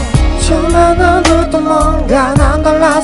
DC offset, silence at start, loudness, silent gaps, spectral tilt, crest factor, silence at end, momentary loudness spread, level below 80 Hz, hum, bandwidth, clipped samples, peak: under 0.1%; 0 s; -10 LUFS; none; -5.5 dB/octave; 10 dB; 0 s; 4 LU; -16 dBFS; none; 11.5 kHz; 0.2%; 0 dBFS